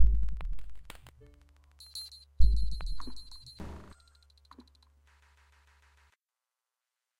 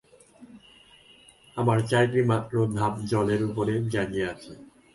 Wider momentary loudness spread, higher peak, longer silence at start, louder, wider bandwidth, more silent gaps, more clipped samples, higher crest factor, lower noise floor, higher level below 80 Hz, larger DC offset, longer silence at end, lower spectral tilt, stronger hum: first, 27 LU vs 10 LU; about the same, -10 dBFS vs -10 dBFS; second, 0 s vs 0.4 s; second, -37 LUFS vs -26 LUFS; about the same, 11.5 kHz vs 11.5 kHz; neither; neither; about the same, 20 dB vs 18 dB; first, under -90 dBFS vs -55 dBFS; first, -36 dBFS vs -56 dBFS; neither; first, 3.4 s vs 0.3 s; second, -5.5 dB/octave vs -7 dB/octave; neither